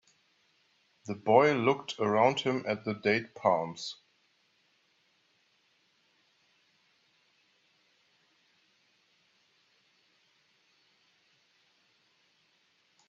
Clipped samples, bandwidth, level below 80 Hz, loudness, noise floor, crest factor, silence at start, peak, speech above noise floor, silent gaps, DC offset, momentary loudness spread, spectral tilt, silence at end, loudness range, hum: under 0.1%; 8 kHz; -80 dBFS; -29 LUFS; -71 dBFS; 26 dB; 1.05 s; -8 dBFS; 43 dB; none; under 0.1%; 17 LU; -5.5 dB/octave; 9.15 s; 10 LU; none